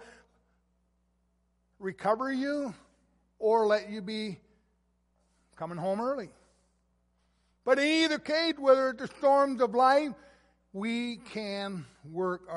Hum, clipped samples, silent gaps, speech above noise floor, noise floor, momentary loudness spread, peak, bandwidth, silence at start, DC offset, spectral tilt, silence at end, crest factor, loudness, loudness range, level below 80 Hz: none; under 0.1%; none; 45 dB; -73 dBFS; 16 LU; -10 dBFS; 11.5 kHz; 0 s; under 0.1%; -4.5 dB/octave; 0 s; 22 dB; -29 LUFS; 11 LU; -70 dBFS